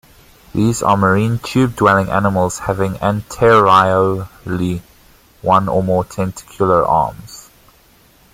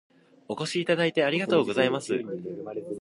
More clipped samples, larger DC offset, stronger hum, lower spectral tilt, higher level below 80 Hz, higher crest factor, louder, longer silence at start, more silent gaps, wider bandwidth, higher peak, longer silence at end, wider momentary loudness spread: neither; neither; neither; about the same, -6 dB/octave vs -5 dB/octave; first, -42 dBFS vs -72 dBFS; about the same, 16 dB vs 20 dB; first, -15 LUFS vs -27 LUFS; about the same, 0.55 s vs 0.5 s; neither; first, 16.5 kHz vs 11.5 kHz; first, 0 dBFS vs -8 dBFS; first, 0.95 s vs 0 s; about the same, 13 LU vs 12 LU